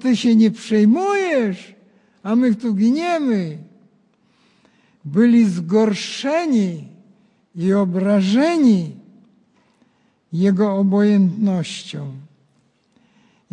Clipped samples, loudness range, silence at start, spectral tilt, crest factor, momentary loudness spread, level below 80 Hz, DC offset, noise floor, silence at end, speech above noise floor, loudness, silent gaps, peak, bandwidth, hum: under 0.1%; 2 LU; 0 s; -7 dB/octave; 14 dB; 16 LU; -68 dBFS; under 0.1%; -61 dBFS; 1.3 s; 45 dB; -17 LUFS; none; -4 dBFS; 10 kHz; none